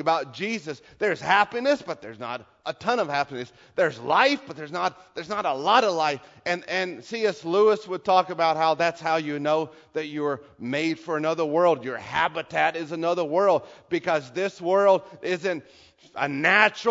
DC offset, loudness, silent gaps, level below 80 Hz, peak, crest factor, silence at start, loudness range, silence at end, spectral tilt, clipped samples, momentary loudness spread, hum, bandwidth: under 0.1%; -24 LUFS; none; -68 dBFS; -2 dBFS; 22 dB; 0 s; 2 LU; 0 s; -4.5 dB/octave; under 0.1%; 12 LU; none; 7.8 kHz